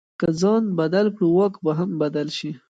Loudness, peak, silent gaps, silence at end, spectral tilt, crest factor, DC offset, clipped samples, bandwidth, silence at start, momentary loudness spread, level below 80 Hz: -21 LUFS; -8 dBFS; none; 0.15 s; -7 dB/octave; 14 dB; under 0.1%; under 0.1%; 9 kHz; 0.2 s; 6 LU; -62 dBFS